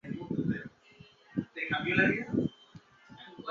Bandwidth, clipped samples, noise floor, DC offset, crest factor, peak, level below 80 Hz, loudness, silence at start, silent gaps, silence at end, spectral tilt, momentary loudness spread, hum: 7.2 kHz; under 0.1%; -58 dBFS; under 0.1%; 22 dB; -14 dBFS; -62 dBFS; -32 LUFS; 0.05 s; none; 0 s; -7.5 dB/octave; 21 LU; none